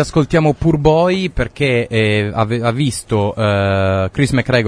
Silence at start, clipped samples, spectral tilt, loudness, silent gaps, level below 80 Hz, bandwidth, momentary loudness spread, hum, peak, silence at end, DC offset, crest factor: 0 s; under 0.1%; -6.5 dB/octave; -15 LUFS; none; -34 dBFS; 11 kHz; 5 LU; none; 0 dBFS; 0 s; under 0.1%; 14 dB